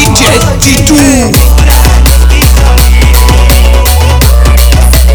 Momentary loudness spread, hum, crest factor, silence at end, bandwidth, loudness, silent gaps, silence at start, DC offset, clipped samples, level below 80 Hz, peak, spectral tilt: 1 LU; none; 4 dB; 0 s; over 20 kHz; -5 LUFS; none; 0 s; under 0.1%; 30%; -4 dBFS; 0 dBFS; -4.5 dB/octave